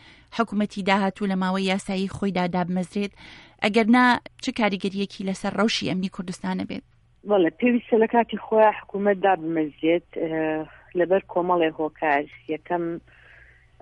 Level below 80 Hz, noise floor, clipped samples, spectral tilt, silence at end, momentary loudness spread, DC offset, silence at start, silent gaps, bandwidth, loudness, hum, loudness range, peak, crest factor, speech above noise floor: -58 dBFS; -52 dBFS; under 0.1%; -6 dB/octave; 0.8 s; 11 LU; under 0.1%; 0.3 s; none; 11.5 kHz; -24 LUFS; none; 3 LU; -6 dBFS; 18 dB; 29 dB